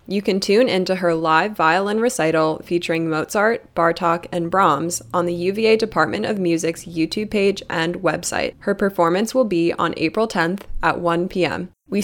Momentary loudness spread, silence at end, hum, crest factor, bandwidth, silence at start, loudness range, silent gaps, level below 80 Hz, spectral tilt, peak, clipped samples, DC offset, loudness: 6 LU; 0 s; none; 18 dB; 18.5 kHz; 0.1 s; 2 LU; none; -44 dBFS; -5 dB/octave; -2 dBFS; under 0.1%; under 0.1%; -19 LUFS